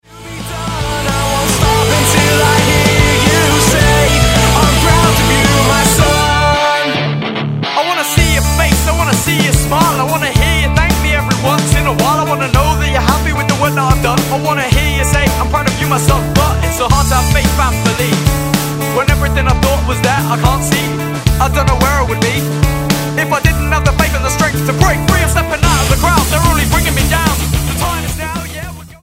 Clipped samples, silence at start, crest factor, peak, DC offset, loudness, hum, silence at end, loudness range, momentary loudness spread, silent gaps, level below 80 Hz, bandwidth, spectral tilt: under 0.1%; 0.1 s; 12 dB; 0 dBFS; under 0.1%; -12 LUFS; none; 0.05 s; 4 LU; 6 LU; none; -18 dBFS; 16.5 kHz; -4 dB/octave